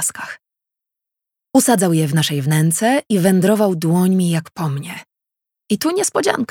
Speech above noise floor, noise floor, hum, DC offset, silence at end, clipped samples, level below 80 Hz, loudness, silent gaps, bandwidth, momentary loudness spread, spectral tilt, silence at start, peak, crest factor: 68 dB; -84 dBFS; none; under 0.1%; 0.05 s; under 0.1%; -64 dBFS; -16 LUFS; none; 17.5 kHz; 13 LU; -5 dB/octave; 0 s; 0 dBFS; 18 dB